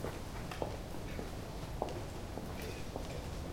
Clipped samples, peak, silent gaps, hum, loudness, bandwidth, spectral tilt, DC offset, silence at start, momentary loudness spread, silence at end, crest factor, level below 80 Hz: under 0.1%; -18 dBFS; none; none; -43 LUFS; 16.5 kHz; -5.5 dB/octave; under 0.1%; 0 s; 3 LU; 0 s; 24 dB; -48 dBFS